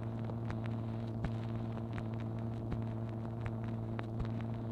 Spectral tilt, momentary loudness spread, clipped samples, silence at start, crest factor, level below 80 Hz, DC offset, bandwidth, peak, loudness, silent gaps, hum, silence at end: -9.5 dB/octave; 1 LU; under 0.1%; 0 s; 16 dB; -52 dBFS; under 0.1%; 5.2 kHz; -22 dBFS; -40 LUFS; none; none; 0 s